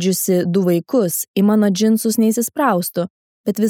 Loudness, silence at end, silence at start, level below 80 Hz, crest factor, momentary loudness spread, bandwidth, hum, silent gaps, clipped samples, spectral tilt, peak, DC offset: -17 LUFS; 0 s; 0 s; -70 dBFS; 14 dB; 9 LU; 18.5 kHz; none; 1.28-1.34 s, 3.10-3.44 s; under 0.1%; -5.5 dB/octave; -2 dBFS; under 0.1%